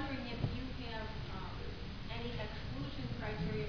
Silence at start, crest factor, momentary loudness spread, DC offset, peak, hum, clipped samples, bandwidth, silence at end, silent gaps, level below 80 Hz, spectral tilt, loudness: 0 s; 20 dB; 5 LU; 0.3%; -20 dBFS; none; under 0.1%; 5.4 kHz; 0 s; none; -48 dBFS; -5 dB/octave; -43 LUFS